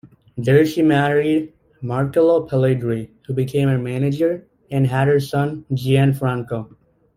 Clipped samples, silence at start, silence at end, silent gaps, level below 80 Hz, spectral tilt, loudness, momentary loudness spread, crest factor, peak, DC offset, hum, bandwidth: under 0.1%; 0.05 s; 0.5 s; none; -52 dBFS; -8 dB/octave; -19 LUFS; 11 LU; 16 dB; -2 dBFS; under 0.1%; none; 15.5 kHz